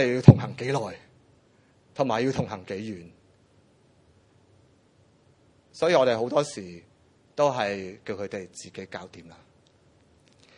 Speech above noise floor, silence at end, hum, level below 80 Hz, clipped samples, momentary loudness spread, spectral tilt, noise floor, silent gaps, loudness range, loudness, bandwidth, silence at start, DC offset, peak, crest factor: 37 dB; 1.35 s; none; -54 dBFS; under 0.1%; 20 LU; -7 dB/octave; -61 dBFS; none; 9 LU; -25 LUFS; 10.5 kHz; 0 s; under 0.1%; 0 dBFS; 28 dB